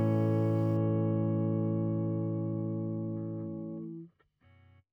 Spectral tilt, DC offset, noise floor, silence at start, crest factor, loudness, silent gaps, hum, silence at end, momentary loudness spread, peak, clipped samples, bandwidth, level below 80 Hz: -11.5 dB/octave; under 0.1%; -65 dBFS; 0 s; 12 dB; -32 LUFS; none; none; 0.85 s; 12 LU; -20 dBFS; under 0.1%; 3.2 kHz; -76 dBFS